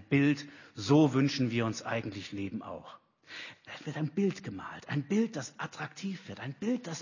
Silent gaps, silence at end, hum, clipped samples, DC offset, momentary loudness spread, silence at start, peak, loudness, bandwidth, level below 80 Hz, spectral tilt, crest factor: none; 0 s; none; under 0.1%; under 0.1%; 17 LU; 0 s; -12 dBFS; -32 LUFS; 7.4 kHz; -66 dBFS; -6 dB/octave; 20 dB